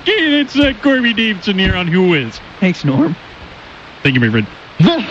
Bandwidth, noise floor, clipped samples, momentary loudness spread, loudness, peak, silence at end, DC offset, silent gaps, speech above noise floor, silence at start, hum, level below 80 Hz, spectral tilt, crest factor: 7.8 kHz; -35 dBFS; under 0.1%; 17 LU; -14 LUFS; -2 dBFS; 0 s; under 0.1%; none; 22 dB; 0 s; none; -34 dBFS; -6.5 dB/octave; 12 dB